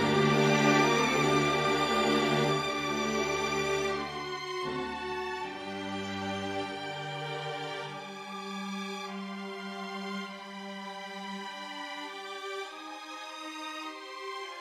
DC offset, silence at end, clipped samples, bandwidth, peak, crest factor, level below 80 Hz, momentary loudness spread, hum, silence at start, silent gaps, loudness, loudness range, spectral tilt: under 0.1%; 0 s; under 0.1%; 15 kHz; -10 dBFS; 20 dB; -62 dBFS; 15 LU; none; 0 s; none; -32 LUFS; 12 LU; -4.5 dB/octave